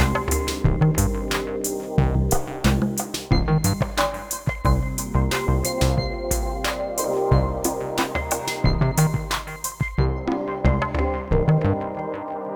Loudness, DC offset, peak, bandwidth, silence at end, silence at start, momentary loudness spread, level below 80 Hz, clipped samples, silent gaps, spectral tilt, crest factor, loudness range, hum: -23 LUFS; under 0.1%; -4 dBFS; over 20 kHz; 0 s; 0 s; 6 LU; -28 dBFS; under 0.1%; none; -5.5 dB/octave; 18 dB; 1 LU; none